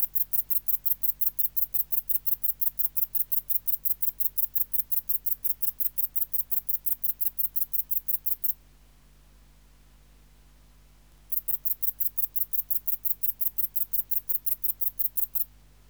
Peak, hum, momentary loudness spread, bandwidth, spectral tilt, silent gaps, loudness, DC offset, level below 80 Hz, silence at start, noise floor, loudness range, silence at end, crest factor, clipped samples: -8 dBFS; 50 Hz at -55 dBFS; 2 LU; over 20 kHz; -1.5 dB/octave; none; -25 LUFS; under 0.1%; -58 dBFS; 0 s; -57 dBFS; 7 LU; 0.45 s; 20 dB; under 0.1%